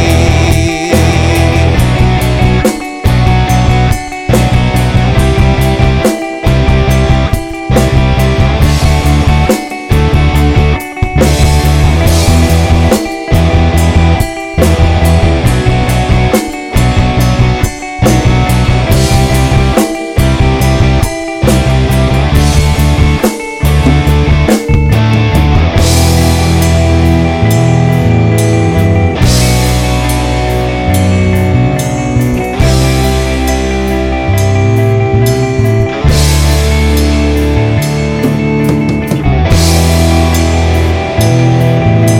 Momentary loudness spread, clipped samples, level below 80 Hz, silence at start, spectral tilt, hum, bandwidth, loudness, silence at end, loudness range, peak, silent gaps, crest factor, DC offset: 4 LU; 2%; -14 dBFS; 0 s; -6 dB/octave; none; 17 kHz; -9 LUFS; 0 s; 2 LU; 0 dBFS; none; 8 dB; under 0.1%